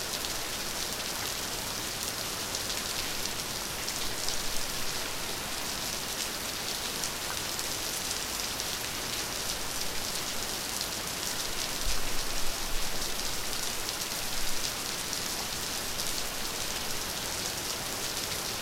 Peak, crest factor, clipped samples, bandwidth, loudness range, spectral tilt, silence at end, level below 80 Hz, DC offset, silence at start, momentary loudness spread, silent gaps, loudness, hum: -10 dBFS; 22 dB; under 0.1%; 17 kHz; 0 LU; -1 dB/octave; 0 s; -44 dBFS; under 0.1%; 0 s; 1 LU; none; -32 LUFS; none